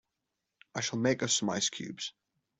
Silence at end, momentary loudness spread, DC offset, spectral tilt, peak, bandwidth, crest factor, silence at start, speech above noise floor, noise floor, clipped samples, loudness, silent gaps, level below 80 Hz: 0.5 s; 13 LU; under 0.1%; -3 dB/octave; -16 dBFS; 8.2 kHz; 20 dB; 0.75 s; 54 dB; -86 dBFS; under 0.1%; -32 LUFS; none; -72 dBFS